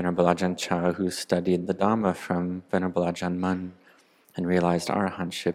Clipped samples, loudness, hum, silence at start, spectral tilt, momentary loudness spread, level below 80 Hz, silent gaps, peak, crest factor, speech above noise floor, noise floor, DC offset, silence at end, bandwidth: under 0.1%; -26 LUFS; none; 0 s; -6 dB/octave; 6 LU; -66 dBFS; none; -4 dBFS; 22 dB; 33 dB; -59 dBFS; under 0.1%; 0 s; 14.5 kHz